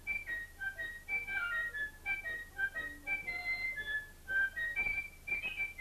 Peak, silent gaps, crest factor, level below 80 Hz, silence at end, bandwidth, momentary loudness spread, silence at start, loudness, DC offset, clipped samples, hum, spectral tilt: -26 dBFS; none; 14 dB; -56 dBFS; 0 s; 14 kHz; 6 LU; 0 s; -37 LUFS; under 0.1%; under 0.1%; none; -2.5 dB/octave